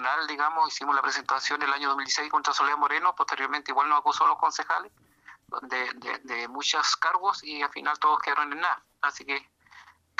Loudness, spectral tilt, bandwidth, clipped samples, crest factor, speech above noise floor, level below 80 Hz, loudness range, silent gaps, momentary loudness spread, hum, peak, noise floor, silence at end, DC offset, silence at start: -26 LUFS; 0.5 dB/octave; 10.5 kHz; under 0.1%; 18 dB; 27 dB; -76 dBFS; 3 LU; none; 9 LU; none; -10 dBFS; -54 dBFS; 0.35 s; under 0.1%; 0 s